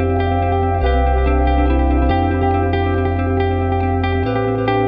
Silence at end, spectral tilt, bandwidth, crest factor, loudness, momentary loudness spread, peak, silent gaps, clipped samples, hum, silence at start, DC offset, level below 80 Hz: 0 s; -10.5 dB/octave; 5.2 kHz; 12 dB; -17 LUFS; 2 LU; -4 dBFS; none; under 0.1%; none; 0 s; under 0.1%; -20 dBFS